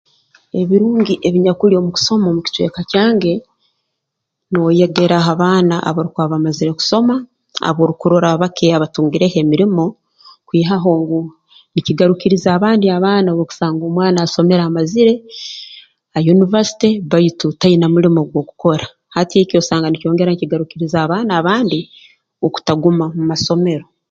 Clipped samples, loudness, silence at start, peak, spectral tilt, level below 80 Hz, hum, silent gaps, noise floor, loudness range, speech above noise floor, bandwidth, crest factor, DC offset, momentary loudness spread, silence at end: under 0.1%; -14 LUFS; 0.55 s; 0 dBFS; -6.5 dB/octave; -54 dBFS; none; none; -76 dBFS; 2 LU; 63 dB; 7.6 kHz; 14 dB; under 0.1%; 9 LU; 0.25 s